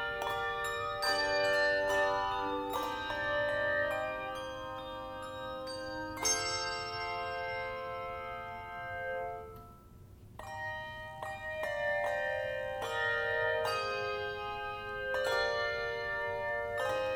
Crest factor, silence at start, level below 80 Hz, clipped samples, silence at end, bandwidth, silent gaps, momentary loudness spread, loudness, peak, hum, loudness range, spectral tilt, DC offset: 18 dB; 0 s; -58 dBFS; under 0.1%; 0 s; 17.5 kHz; none; 12 LU; -35 LUFS; -18 dBFS; none; 9 LU; -2 dB/octave; under 0.1%